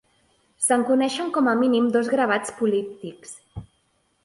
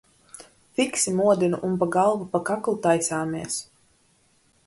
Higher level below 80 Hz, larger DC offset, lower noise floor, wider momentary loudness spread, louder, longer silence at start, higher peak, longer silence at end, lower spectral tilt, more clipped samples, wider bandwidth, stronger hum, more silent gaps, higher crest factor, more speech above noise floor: first, -58 dBFS vs -64 dBFS; neither; first, -67 dBFS vs -63 dBFS; first, 20 LU vs 11 LU; about the same, -22 LUFS vs -24 LUFS; first, 0.6 s vs 0.4 s; about the same, -8 dBFS vs -8 dBFS; second, 0.6 s vs 1.05 s; about the same, -3.5 dB/octave vs -4.5 dB/octave; neither; about the same, 11.5 kHz vs 12 kHz; neither; neither; about the same, 16 dB vs 18 dB; first, 46 dB vs 40 dB